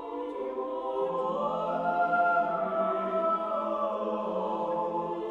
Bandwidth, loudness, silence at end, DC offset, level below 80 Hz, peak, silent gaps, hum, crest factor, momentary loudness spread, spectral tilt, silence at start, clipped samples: 7.2 kHz; -30 LUFS; 0 s; under 0.1%; -70 dBFS; -16 dBFS; none; none; 14 dB; 8 LU; -7.5 dB/octave; 0 s; under 0.1%